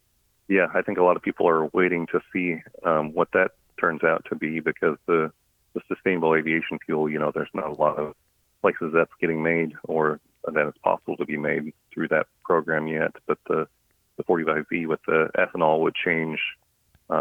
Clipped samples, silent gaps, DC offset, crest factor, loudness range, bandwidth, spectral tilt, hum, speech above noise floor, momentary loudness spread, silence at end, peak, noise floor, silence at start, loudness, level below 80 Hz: under 0.1%; none; under 0.1%; 20 dB; 3 LU; 4 kHz; -8 dB/octave; none; 28 dB; 8 LU; 0 s; -4 dBFS; -52 dBFS; 0.5 s; -24 LUFS; -64 dBFS